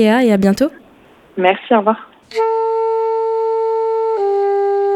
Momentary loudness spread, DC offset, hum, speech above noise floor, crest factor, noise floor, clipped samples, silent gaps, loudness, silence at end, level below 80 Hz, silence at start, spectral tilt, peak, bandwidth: 6 LU; under 0.1%; none; 32 dB; 16 dB; -46 dBFS; under 0.1%; none; -16 LUFS; 0 s; -54 dBFS; 0 s; -6.5 dB/octave; 0 dBFS; 14 kHz